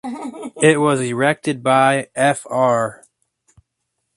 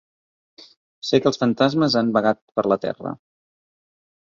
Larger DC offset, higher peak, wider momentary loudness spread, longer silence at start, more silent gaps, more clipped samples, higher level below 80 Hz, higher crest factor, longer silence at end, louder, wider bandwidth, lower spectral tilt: neither; about the same, 0 dBFS vs -2 dBFS; about the same, 12 LU vs 13 LU; second, 0.05 s vs 1.05 s; second, none vs 2.42-2.48 s; neither; about the same, -62 dBFS vs -62 dBFS; about the same, 18 dB vs 20 dB; about the same, 1.2 s vs 1.1 s; first, -17 LUFS vs -20 LUFS; first, 11.5 kHz vs 7.4 kHz; about the same, -5 dB/octave vs -6 dB/octave